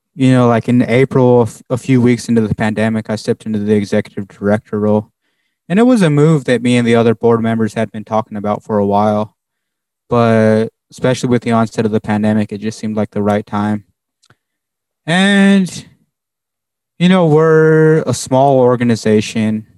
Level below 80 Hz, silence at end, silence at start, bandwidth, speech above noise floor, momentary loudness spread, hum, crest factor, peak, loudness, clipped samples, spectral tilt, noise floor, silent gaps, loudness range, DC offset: -54 dBFS; 0.15 s; 0.15 s; 12 kHz; 69 dB; 10 LU; none; 12 dB; 0 dBFS; -13 LUFS; under 0.1%; -6.5 dB/octave; -82 dBFS; none; 5 LU; under 0.1%